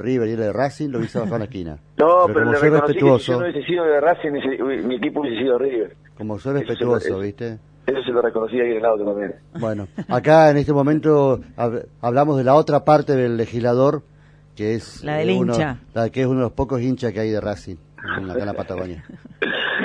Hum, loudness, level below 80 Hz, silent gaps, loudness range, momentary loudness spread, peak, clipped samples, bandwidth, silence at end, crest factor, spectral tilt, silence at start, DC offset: 50 Hz at -45 dBFS; -19 LUFS; -48 dBFS; none; 6 LU; 13 LU; -2 dBFS; under 0.1%; 10 kHz; 0 s; 18 dB; -7.5 dB/octave; 0 s; under 0.1%